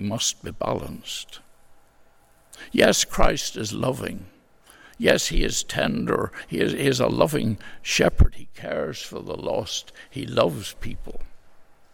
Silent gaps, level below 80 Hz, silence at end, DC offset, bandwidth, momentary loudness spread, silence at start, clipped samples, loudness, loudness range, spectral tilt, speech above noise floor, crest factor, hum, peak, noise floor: none; -32 dBFS; 0.2 s; under 0.1%; 17 kHz; 15 LU; 0 s; under 0.1%; -24 LUFS; 3 LU; -4 dB/octave; 32 dB; 22 dB; none; -2 dBFS; -55 dBFS